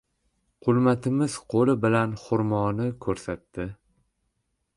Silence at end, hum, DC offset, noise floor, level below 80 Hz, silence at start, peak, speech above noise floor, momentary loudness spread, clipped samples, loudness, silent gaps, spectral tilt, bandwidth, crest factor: 1 s; none; under 0.1%; -76 dBFS; -54 dBFS; 0.65 s; -10 dBFS; 52 dB; 13 LU; under 0.1%; -25 LUFS; none; -7 dB/octave; 11.5 kHz; 16 dB